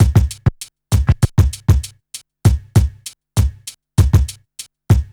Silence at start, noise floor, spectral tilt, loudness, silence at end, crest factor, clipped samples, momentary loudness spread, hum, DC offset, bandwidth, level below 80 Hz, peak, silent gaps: 0 s; -39 dBFS; -6.5 dB/octave; -17 LUFS; 0.1 s; 16 dB; under 0.1%; 20 LU; none; under 0.1%; 17.5 kHz; -22 dBFS; 0 dBFS; none